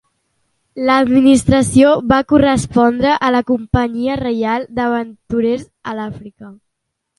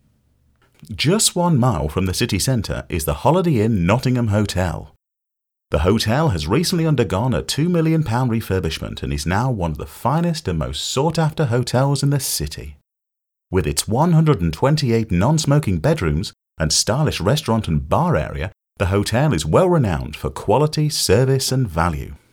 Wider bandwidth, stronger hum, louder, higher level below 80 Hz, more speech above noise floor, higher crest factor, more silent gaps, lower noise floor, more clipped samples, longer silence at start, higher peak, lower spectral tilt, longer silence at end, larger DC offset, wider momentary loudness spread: second, 11.5 kHz vs 17.5 kHz; neither; first, -14 LUFS vs -19 LUFS; about the same, -36 dBFS vs -36 dBFS; second, 60 dB vs 64 dB; about the same, 14 dB vs 18 dB; neither; second, -75 dBFS vs -82 dBFS; neither; about the same, 0.75 s vs 0.8 s; about the same, 0 dBFS vs -2 dBFS; about the same, -6 dB/octave vs -5.5 dB/octave; first, 0.65 s vs 0.15 s; neither; first, 14 LU vs 9 LU